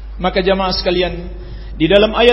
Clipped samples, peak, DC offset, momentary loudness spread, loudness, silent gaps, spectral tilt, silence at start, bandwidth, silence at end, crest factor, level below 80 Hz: under 0.1%; 0 dBFS; under 0.1%; 19 LU; -15 LUFS; none; -6.5 dB/octave; 0 s; 7.4 kHz; 0 s; 14 dB; -28 dBFS